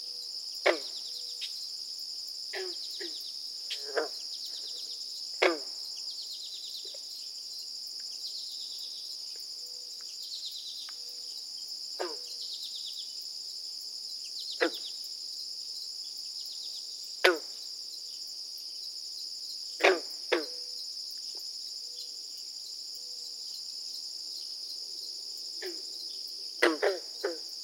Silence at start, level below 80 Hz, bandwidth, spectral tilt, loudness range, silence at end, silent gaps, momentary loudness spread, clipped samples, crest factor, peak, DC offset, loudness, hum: 0 s; under -90 dBFS; 16.5 kHz; 1.5 dB/octave; 5 LU; 0 s; none; 10 LU; under 0.1%; 30 dB; -6 dBFS; under 0.1%; -35 LUFS; none